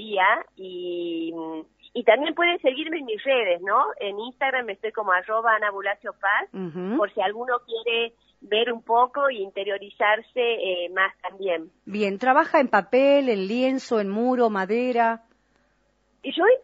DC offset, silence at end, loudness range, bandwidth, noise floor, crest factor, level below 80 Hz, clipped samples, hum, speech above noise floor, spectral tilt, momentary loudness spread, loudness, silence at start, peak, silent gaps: under 0.1%; 0.05 s; 3 LU; 7.6 kHz; -67 dBFS; 20 dB; -72 dBFS; under 0.1%; none; 43 dB; -1.5 dB/octave; 11 LU; -23 LUFS; 0 s; -4 dBFS; none